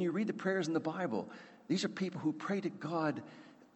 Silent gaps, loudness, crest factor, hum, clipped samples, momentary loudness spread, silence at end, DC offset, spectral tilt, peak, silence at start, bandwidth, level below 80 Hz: none; -37 LUFS; 16 dB; none; under 0.1%; 14 LU; 0.1 s; under 0.1%; -6 dB/octave; -20 dBFS; 0 s; 8.4 kHz; -84 dBFS